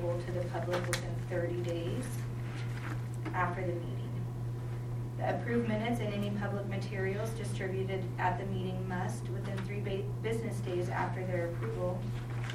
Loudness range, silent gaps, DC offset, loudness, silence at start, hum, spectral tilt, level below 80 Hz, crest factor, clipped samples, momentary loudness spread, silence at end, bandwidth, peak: 2 LU; none; under 0.1%; -36 LUFS; 0 s; none; -6.5 dB/octave; -52 dBFS; 20 dB; under 0.1%; 5 LU; 0 s; 15 kHz; -14 dBFS